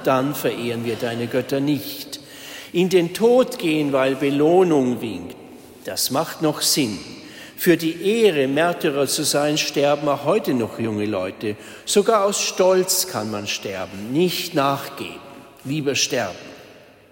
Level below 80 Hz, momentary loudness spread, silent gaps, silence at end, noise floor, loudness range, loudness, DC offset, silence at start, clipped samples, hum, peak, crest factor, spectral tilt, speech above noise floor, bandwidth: -62 dBFS; 16 LU; none; 0.4 s; -46 dBFS; 4 LU; -20 LUFS; under 0.1%; 0 s; under 0.1%; none; -4 dBFS; 16 dB; -4 dB/octave; 26 dB; 16.5 kHz